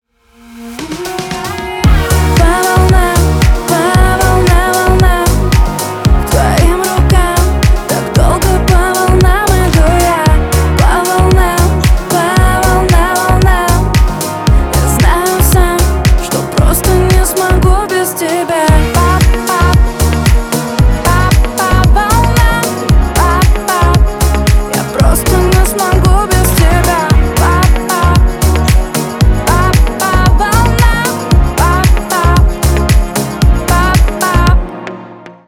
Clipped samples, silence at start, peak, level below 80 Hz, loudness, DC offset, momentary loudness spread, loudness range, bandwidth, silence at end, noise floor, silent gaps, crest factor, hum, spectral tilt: under 0.1%; 0.5 s; 0 dBFS; -12 dBFS; -10 LUFS; under 0.1%; 4 LU; 1 LU; 18 kHz; 0.15 s; -41 dBFS; none; 8 dB; none; -5 dB/octave